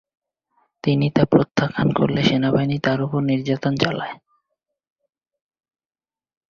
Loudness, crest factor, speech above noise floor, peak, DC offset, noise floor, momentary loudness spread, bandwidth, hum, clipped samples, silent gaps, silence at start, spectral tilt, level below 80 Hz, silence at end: -20 LUFS; 20 dB; over 71 dB; -2 dBFS; under 0.1%; under -90 dBFS; 5 LU; 7 kHz; none; under 0.1%; none; 0.85 s; -7 dB/octave; -54 dBFS; 2.35 s